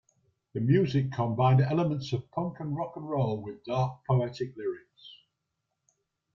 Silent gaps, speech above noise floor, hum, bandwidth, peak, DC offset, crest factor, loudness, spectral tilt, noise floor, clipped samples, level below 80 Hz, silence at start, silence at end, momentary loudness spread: none; 54 dB; none; 7 kHz; -12 dBFS; under 0.1%; 18 dB; -29 LUFS; -8.5 dB/octave; -83 dBFS; under 0.1%; -62 dBFS; 0.55 s; 1.2 s; 12 LU